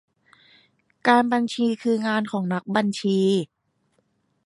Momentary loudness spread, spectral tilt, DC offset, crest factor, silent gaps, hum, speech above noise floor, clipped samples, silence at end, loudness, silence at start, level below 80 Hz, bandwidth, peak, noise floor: 7 LU; -6 dB/octave; under 0.1%; 20 dB; none; none; 47 dB; under 0.1%; 1 s; -22 LUFS; 1.05 s; -70 dBFS; 11.5 kHz; -4 dBFS; -69 dBFS